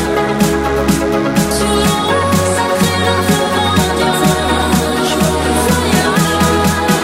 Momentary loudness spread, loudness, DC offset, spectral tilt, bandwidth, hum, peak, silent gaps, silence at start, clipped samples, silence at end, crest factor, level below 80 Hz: 2 LU; -13 LUFS; under 0.1%; -4.5 dB/octave; 16.5 kHz; none; 0 dBFS; none; 0 s; under 0.1%; 0 s; 12 dB; -28 dBFS